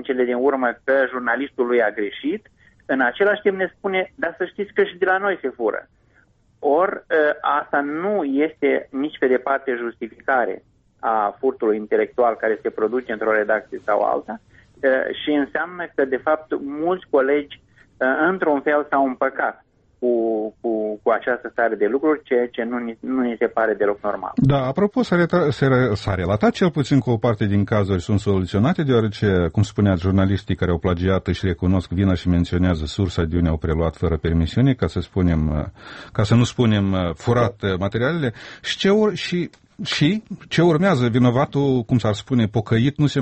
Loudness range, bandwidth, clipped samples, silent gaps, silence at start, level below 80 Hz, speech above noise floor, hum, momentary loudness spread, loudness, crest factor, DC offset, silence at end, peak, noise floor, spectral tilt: 3 LU; 8.4 kHz; under 0.1%; none; 0 s; -40 dBFS; 38 dB; none; 7 LU; -20 LUFS; 14 dB; under 0.1%; 0 s; -6 dBFS; -58 dBFS; -7 dB/octave